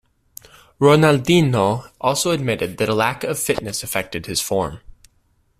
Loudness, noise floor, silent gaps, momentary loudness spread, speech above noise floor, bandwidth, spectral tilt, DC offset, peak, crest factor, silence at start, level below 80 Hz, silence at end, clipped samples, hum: -19 LUFS; -62 dBFS; none; 9 LU; 44 dB; 16 kHz; -5 dB/octave; under 0.1%; -2 dBFS; 18 dB; 0.8 s; -48 dBFS; 0.8 s; under 0.1%; none